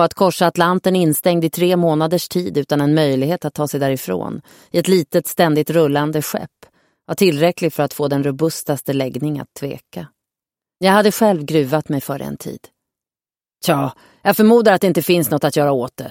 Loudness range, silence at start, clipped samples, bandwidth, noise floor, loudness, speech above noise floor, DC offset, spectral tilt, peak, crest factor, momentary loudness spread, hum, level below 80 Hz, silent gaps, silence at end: 4 LU; 0 s; under 0.1%; 17 kHz; under -90 dBFS; -17 LUFS; over 73 dB; under 0.1%; -5.5 dB/octave; 0 dBFS; 16 dB; 13 LU; none; -58 dBFS; none; 0 s